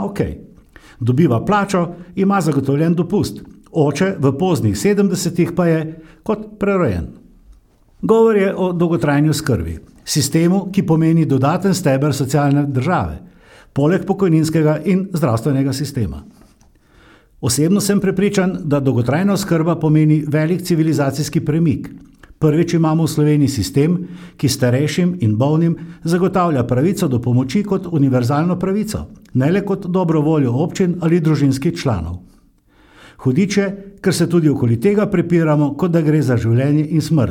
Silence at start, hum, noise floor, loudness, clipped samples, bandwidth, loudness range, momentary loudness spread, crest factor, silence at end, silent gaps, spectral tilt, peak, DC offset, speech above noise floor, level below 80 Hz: 0 s; none; -52 dBFS; -16 LUFS; under 0.1%; 17 kHz; 3 LU; 9 LU; 16 dB; 0 s; none; -6.5 dB/octave; -2 dBFS; under 0.1%; 36 dB; -42 dBFS